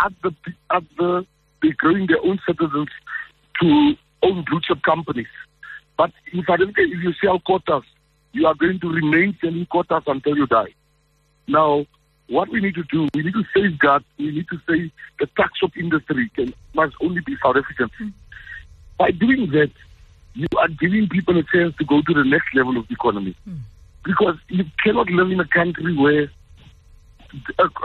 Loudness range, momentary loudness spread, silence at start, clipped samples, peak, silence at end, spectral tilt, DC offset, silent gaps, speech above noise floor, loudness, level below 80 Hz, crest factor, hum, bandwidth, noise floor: 3 LU; 14 LU; 0 s; under 0.1%; -4 dBFS; 0 s; -8.5 dB/octave; under 0.1%; none; 42 dB; -20 LUFS; -50 dBFS; 16 dB; none; 4.4 kHz; -61 dBFS